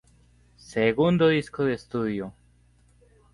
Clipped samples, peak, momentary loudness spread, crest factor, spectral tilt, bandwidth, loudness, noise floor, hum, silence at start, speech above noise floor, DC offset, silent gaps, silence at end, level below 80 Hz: under 0.1%; -8 dBFS; 13 LU; 18 dB; -7 dB/octave; 11.5 kHz; -25 LUFS; -60 dBFS; 60 Hz at -50 dBFS; 0.7 s; 36 dB; under 0.1%; none; 1.05 s; -56 dBFS